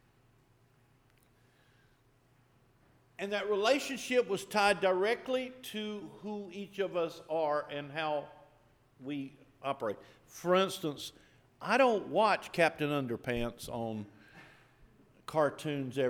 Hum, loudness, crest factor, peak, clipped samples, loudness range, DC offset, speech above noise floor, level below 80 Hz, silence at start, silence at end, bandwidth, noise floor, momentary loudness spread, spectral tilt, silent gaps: none; -33 LUFS; 22 dB; -14 dBFS; under 0.1%; 6 LU; under 0.1%; 35 dB; -64 dBFS; 3.2 s; 0 s; 19 kHz; -68 dBFS; 15 LU; -4.5 dB/octave; none